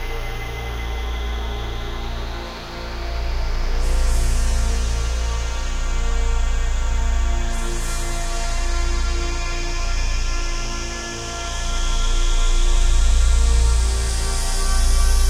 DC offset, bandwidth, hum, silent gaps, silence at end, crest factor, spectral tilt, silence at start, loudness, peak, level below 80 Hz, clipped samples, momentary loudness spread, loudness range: 0.2%; 13 kHz; none; none; 0 s; 14 dB; -3.5 dB/octave; 0 s; -24 LUFS; -6 dBFS; -18 dBFS; under 0.1%; 9 LU; 5 LU